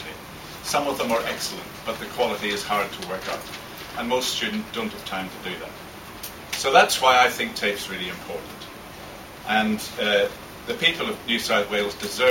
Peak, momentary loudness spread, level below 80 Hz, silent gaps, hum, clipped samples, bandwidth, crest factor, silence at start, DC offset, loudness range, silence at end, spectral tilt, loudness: -2 dBFS; 18 LU; -54 dBFS; none; none; under 0.1%; 17 kHz; 22 dB; 0 s; under 0.1%; 6 LU; 0 s; -2.5 dB/octave; -24 LUFS